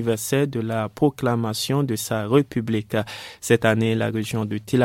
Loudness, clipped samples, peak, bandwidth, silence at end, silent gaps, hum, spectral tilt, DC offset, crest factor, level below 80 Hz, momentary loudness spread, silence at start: -23 LUFS; under 0.1%; -2 dBFS; 16.5 kHz; 0 s; none; none; -5.5 dB/octave; under 0.1%; 20 dB; -56 dBFS; 7 LU; 0 s